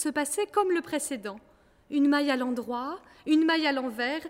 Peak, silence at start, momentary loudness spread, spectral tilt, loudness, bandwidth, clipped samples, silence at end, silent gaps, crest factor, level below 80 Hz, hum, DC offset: -12 dBFS; 0 s; 13 LU; -2.5 dB/octave; -27 LUFS; 16 kHz; under 0.1%; 0 s; none; 16 dB; -68 dBFS; none; under 0.1%